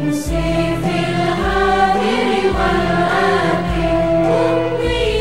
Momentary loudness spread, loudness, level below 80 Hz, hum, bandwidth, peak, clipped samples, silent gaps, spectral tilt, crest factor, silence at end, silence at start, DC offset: 3 LU; -16 LUFS; -28 dBFS; none; 14 kHz; -2 dBFS; under 0.1%; none; -6 dB/octave; 12 dB; 0 s; 0 s; 1%